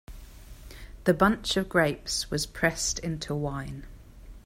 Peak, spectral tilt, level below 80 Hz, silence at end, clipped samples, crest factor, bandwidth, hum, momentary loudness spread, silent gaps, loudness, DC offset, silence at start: -8 dBFS; -4 dB/octave; -46 dBFS; 0.05 s; under 0.1%; 22 dB; 16 kHz; none; 19 LU; none; -27 LUFS; under 0.1%; 0.1 s